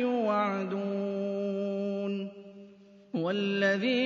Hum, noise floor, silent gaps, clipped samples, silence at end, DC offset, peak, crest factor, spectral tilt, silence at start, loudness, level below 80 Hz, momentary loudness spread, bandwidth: none; -54 dBFS; none; under 0.1%; 0 s; under 0.1%; -16 dBFS; 16 dB; -6.5 dB/octave; 0 s; -31 LUFS; -82 dBFS; 11 LU; 7.4 kHz